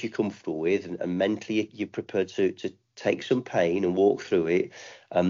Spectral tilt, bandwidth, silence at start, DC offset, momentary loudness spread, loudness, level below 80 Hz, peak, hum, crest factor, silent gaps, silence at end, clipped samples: -5.5 dB/octave; 7.4 kHz; 0 s; under 0.1%; 10 LU; -27 LUFS; -68 dBFS; -10 dBFS; none; 18 dB; none; 0 s; under 0.1%